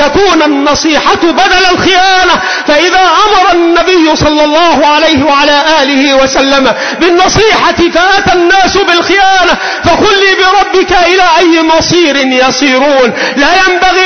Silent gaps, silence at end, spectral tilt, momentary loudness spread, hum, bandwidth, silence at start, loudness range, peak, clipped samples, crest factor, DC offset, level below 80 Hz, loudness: none; 0 s; -3 dB/octave; 3 LU; none; 6.6 kHz; 0 s; 0 LU; 0 dBFS; 0.2%; 6 dB; 2%; -30 dBFS; -6 LUFS